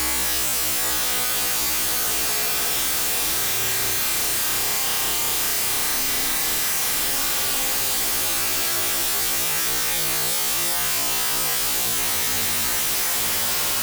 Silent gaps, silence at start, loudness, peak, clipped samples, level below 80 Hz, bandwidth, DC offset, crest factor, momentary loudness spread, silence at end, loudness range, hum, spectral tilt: none; 0 s; -19 LUFS; -12 dBFS; under 0.1%; -46 dBFS; over 20 kHz; under 0.1%; 10 dB; 0 LU; 0 s; 0 LU; none; 0 dB/octave